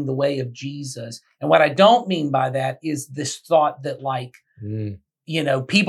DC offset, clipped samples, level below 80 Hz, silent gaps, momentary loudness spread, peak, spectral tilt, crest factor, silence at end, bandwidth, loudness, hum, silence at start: under 0.1%; under 0.1%; -74 dBFS; none; 17 LU; -2 dBFS; -5 dB/octave; 20 dB; 0 s; 13 kHz; -21 LUFS; none; 0 s